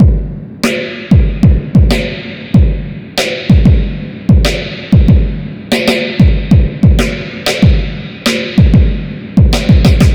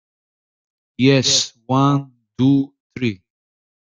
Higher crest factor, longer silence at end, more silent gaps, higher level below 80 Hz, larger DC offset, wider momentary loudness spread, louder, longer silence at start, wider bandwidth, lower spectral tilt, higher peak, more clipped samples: second, 10 dB vs 18 dB; second, 0 s vs 0.7 s; second, none vs 2.80-2.90 s; first, -14 dBFS vs -58 dBFS; neither; second, 10 LU vs 13 LU; first, -11 LUFS vs -18 LUFS; second, 0 s vs 1 s; first, 17.5 kHz vs 9.4 kHz; first, -6.5 dB/octave vs -4.5 dB/octave; about the same, 0 dBFS vs -2 dBFS; first, 1% vs under 0.1%